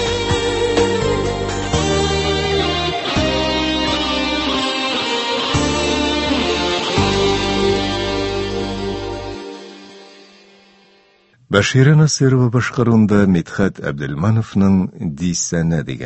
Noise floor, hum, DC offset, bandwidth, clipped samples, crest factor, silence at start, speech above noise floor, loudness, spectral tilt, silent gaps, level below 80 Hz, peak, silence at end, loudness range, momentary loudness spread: -53 dBFS; none; under 0.1%; 8.6 kHz; under 0.1%; 18 dB; 0 s; 39 dB; -17 LUFS; -5 dB/octave; none; -32 dBFS; 0 dBFS; 0 s; 7 LU; 9 LU